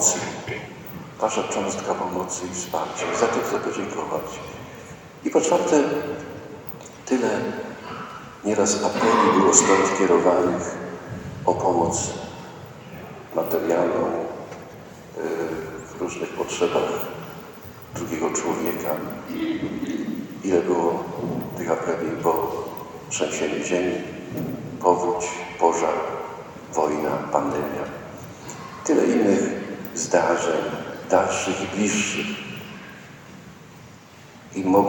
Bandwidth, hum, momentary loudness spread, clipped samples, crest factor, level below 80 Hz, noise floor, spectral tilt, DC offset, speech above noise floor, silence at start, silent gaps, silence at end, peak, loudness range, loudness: 17.5 kHz; none; 18 LU; under 0.1%; 24 dB; -60 dBFS; -45 dBFS; -4 dB/octave; under 0.1%; 23 dB; 0 s; none; 0 s; 0 dBFS; 8 LU; -23 LUFS